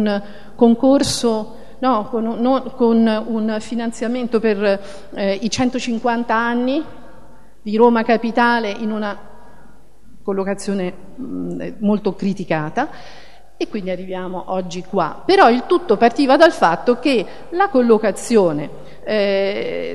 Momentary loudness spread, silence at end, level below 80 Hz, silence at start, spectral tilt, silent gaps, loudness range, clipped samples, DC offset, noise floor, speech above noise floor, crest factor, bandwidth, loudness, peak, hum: 13 LU; 0 s; -50 dBFS; 0 s; -5 dB/octave; none; 8 LU; under 0.1%; 2%; -47 dBFS; 30 dB; 18 dB; 12.5 kHz; -18 LUFS; 0 dBFS; none